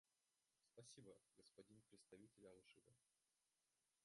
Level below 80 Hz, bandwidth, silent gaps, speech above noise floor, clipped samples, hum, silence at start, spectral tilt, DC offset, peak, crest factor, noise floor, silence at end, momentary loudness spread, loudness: under -90 dBFS; 11.5 kHz; none; over 20 dB; under 0.1%; none; 0.05 s; -4 dB/octave; under 0.1%; -52 dBFS; 20 dB; under -90 dBFS; 0 s; 4 LU; -68 LUFS